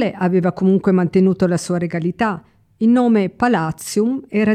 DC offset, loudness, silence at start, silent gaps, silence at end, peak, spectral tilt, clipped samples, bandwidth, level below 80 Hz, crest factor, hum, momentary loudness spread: under 0.1%; -17 LUFS; 0 s; none; 0 s; -4 dBFS; -7 dB/octave; under 0.1%; 14.5 kHz; -54 dBFS; 12 dB; none; 7 LU